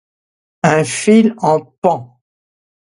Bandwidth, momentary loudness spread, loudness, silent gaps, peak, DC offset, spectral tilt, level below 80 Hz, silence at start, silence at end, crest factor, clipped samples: 11.5 kHz; 6 LU; -14 LUFS; 1.78-1.82 s; 0 dBFS; under 0.1%; -5.5 dB/octave; -58 dBFS; 0.65 s; 0.9 s; 16 dB; under 0.1%